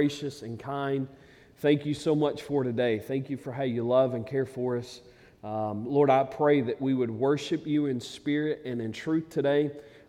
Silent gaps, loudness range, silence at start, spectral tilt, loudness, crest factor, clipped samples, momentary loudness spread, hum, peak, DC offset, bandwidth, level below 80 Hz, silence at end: none; 3 LU; 0 s; -7 dB/octave; -28 LUFS; 18 dB; under 0.1%; 11 LU; none; -10 dBFS; under 0.1%; 14 kHz; -66 dBFS; 0.1 s